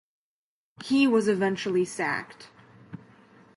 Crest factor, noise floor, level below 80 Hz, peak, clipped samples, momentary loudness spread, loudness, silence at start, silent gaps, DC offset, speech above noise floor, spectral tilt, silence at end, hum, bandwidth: 18 dB; -55 dBFS; -72 dBFS; -12 dBFS; under 0.1%; 24 LU; -25 LUFS; 0.8 s; none; under 0.1%; 30 dB; -5 dB/octave; 0.6 s; none; 11.5 kHz